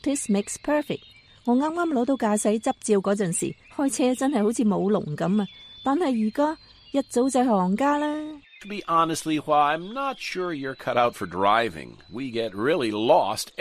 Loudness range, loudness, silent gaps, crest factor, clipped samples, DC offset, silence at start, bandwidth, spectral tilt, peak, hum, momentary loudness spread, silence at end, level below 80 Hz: 1 LU; -24 LUFS; none; 18 dB; under 0.1%; under 0.1%; 0.05 s; 15 kHz; -5 dB/octave; -6 dBFS; none; 10 LU; 0.1 s; -60 dBFS